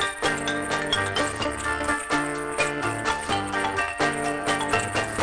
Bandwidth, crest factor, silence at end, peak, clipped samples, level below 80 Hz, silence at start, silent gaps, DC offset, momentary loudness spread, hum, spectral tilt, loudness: 10.5 kHz; 20 dB; 0 s; -6 dBFS; under 0.1%; -46 dBFS; 0 s; none; under 0.1%; 3 LU; none; -3 dB/octave; -25 LUFS